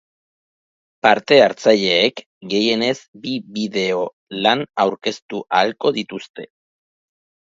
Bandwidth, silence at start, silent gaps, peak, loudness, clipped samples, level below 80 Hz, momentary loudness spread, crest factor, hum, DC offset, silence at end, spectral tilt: 7.8 kHz; 1.05 s; 2.26-2.41 s, 3.08-3.13 s, 4.13-4.27 s, 5.22-5.29 s, 6.29-6.34 s; 0 dBFS; -18 LUFS; under 0.1%; -66 dBFS; 15 LU; 20 dB; none; under 0.1%; 1.1 s; -4 dB/octave